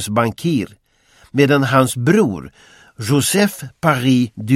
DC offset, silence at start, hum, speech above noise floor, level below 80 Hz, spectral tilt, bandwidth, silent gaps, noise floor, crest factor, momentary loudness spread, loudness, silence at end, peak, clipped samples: under 0.1%; 0 s; none; 36 dB; -52 dBFS; -5.5 dB/octave; 16.5 kHz; none; -52 dBFS; 16 dB; 9 LU; -16 LUFS; 0 s; 0 dBFS; under 0.1%